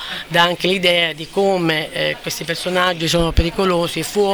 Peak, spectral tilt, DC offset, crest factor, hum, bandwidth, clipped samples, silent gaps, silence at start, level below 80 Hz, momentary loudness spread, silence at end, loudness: 0 dBFS; -4 dB/octave; under 0.1%; 18 dB; none; over 20 kHz; under 0.1%; none; 0 s; -30 dBFS; 6 LU; 0 s; -17 LUFS